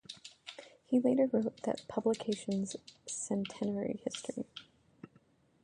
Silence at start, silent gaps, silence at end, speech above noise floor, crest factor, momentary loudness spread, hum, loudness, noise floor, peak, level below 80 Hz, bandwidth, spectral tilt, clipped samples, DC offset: 0.1 s; none; 0.6 s; 33 dB; 20 dB; 19 LU; none; -35 LUFS; -68 dBFS; -16 dBFS; -74 dBFS; 11 kHz; -5 dB/octave; under 0.1%; under 0.1%